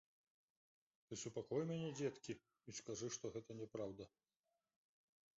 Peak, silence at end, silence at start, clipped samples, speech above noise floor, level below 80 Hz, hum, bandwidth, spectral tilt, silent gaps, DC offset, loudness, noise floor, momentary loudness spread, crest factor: -30 dBFS; 1.3 s; 1.1 s; under 0.1%; over 42 dB; -82 dBFS; none; 7.6 kHz; -6 dB/octave; none; under 0.1%; -49 LUFS; under -90 dBFS; 10 LU; 20 dB